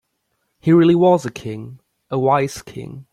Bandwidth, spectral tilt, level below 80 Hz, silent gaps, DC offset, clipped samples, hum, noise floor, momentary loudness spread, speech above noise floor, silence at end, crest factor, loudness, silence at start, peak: 13 kHz; -7.5 dB/octave; -56 dBFS; none; under 0.1%; under 0.1%; none; -71 dBFS; 20 LU; 54 dB; 0.1 s; 16 dB; -17 LUFS; 0.65 s; -2 dBFS